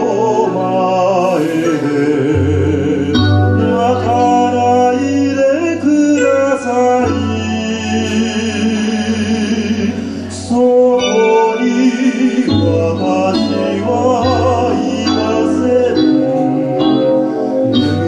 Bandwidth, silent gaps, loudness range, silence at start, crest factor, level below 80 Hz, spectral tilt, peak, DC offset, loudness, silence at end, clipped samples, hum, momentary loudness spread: 10.5 kHz; none; 3 LU; 0 s; 12 dB; -44 dBFS; -6 dB/octave; 0 dBFS; under 0.1%; -13 LUFS; 0 s; under 0.1%; none; 4 LU